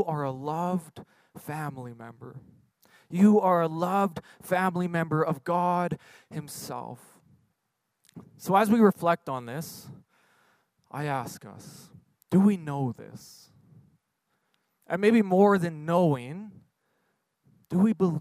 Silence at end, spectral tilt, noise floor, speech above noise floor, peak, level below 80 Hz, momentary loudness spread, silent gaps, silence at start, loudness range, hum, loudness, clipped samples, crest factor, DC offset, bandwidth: 0 s; -7.5 dB/octave; -80 dBFS; 53 dB; -8 dBFS; -72 dBFS; 23 LU; none; 0 s; 6 LU; none; -26 LUFS; under 0.1%; 20 dB; under 0.1%; 15.5 kHz